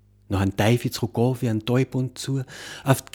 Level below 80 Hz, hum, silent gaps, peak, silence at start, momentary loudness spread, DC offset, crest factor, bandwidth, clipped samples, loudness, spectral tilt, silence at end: -54 dBFS; none; none; -2 dBFS; 0.3 s; 8 LU; under 0.1%; 20 dB; 19 kHz; under 0.1%; -24 LUFS; -6 dB/octave; 0.1 s